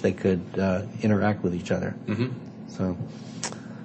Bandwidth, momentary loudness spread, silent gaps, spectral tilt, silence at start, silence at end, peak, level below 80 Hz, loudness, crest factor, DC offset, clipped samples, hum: 8.8 kHz; 11 LU; none; -6.5 dB/octave; 0 s; 0 s; -10 dBFS; -60 dBFS; -28 LUFS; 18 dB; under 0.1%; under 0.1%; none